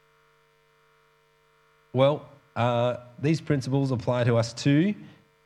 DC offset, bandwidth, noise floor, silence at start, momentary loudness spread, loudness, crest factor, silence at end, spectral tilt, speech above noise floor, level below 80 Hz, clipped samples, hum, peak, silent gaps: under 0.1%; 11 kHz; -64 dBFS; 1.95 s; 8 LU; -25 LUFS; 20 dB; 0.4 s; -7 dB/octave; 39 dB; -66 dBFS; under 0.1%; none; -8 dBFS; none